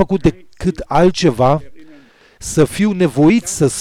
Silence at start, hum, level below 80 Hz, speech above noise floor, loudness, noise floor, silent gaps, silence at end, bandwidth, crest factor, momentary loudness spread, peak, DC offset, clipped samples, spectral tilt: 0 s; none; -36 dBFS; 31 dB; -15 LUFS; -45 dBFS; none; 0 s; 16 kHz; 12 dB; 9 LU; -4 dBFS; under 0.1%; under 0.1%; -6 dB/octave